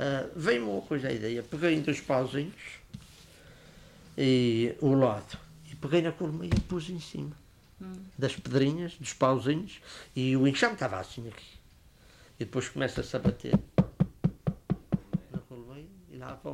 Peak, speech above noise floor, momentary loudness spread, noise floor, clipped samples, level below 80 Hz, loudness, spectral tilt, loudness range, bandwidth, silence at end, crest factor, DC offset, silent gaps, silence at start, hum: -10 dBFS; 28 dB; 19 LU; -57 dBFS; under 0.1%; -50 dBFS; -30 LUFS; -6.5 dB/octave; 4 LU; 14 kHz; 0 s; 20 dB; under 0.1%; none; 0 s; none